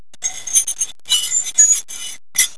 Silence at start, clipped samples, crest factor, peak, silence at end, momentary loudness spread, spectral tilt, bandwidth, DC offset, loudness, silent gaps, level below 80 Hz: 0.2 s; under 0.1%; 18 dB; 0 dBFS; 0.05 s; 13 LU; 4 dB/octave; 11 kHz; 2%; -15 LUFS; none; -58 dBFS